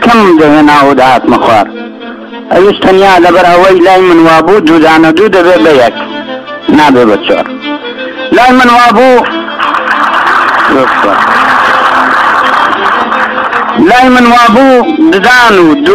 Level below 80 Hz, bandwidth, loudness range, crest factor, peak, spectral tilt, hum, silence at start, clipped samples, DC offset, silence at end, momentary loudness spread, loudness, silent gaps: -36 dBFS; 15 kHz; 3 LU; 4 dB; 0 dBFS; -5 dB/octave; none; 0 s; 8%; under 0.1%; 0 s; 12 LU; -4 LUFS; none